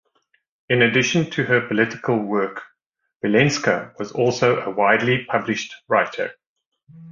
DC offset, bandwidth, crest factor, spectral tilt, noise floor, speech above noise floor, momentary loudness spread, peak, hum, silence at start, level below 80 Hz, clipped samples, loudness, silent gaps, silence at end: under 0.1%; 7.4 kHz; 20 dB; -5 dB/octave; -76 dBFS; 56 dB; 11 LU; -2 dBFS; none; 0.7 s; -60 dBFS; under 0.1%; -20 LUFS; 2.86-2.91 s, 3.16-3.20 s, 6.46-6.56 s, 6.66-6.72 s; 0 s